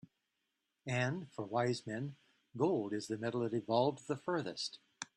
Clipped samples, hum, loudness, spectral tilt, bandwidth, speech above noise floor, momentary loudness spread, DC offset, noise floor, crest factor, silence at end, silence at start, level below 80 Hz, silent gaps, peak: under 0.1%; none; -38 LUFS; -5.5 dB/octave; 11 kHz; 49 dB; 10 LU; under 0.1%; -86 dBFS; 20 dB; 0.1 s; 0.85 s; -78 dBFS; none; -18 dBFS